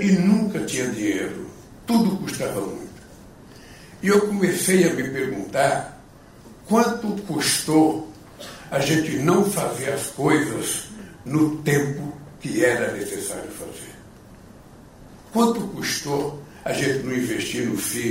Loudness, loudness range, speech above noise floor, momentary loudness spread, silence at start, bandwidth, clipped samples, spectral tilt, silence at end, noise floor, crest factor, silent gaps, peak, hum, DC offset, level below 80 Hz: -22 LUFS; 6 LU; 24 dB; 17 LU; 0 s; 16 kHz; under 0.1%; -4.5 dB/octave; 0 s; -46 dBFS; 18 dB; none; -6 dBFS; none; under 0.1%; -54 dBFS